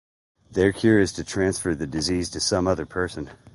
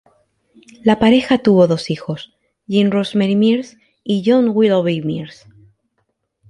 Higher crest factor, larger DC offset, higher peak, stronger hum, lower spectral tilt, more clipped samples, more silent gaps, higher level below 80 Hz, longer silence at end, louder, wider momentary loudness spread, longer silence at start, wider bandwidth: about the same, 18 dB vs 16 dB; neither; second, -6 dBFS vs 0 dBFS; neither; second, -4.5 dB/octave vs -7 dB/octave; neither; neither; first, -44 dBFS vs -54 dBFS; second, 0.2 s vs 1.2 s; second, -23 LUFS vs -15 LUFS; second, 9 LU vs 15 LU; second, 0.5 s vs 0.85 s; about the same, 11.5 kHz vs 11 kHz